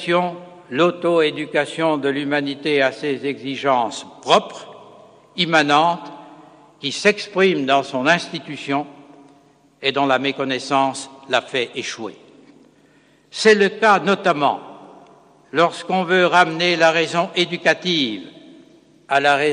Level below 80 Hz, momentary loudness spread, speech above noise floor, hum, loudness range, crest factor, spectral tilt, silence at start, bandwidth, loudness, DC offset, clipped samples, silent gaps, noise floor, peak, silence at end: -68 dBFS; 14 LU; 36 dB; none; 4 LU; 20 dB; -4 dB/octave; 0 s; 10.5 kHz; -18 LUFS; under 0.1%; under 0.1%; none; -54 dBFS; 0 dBFS; 0 s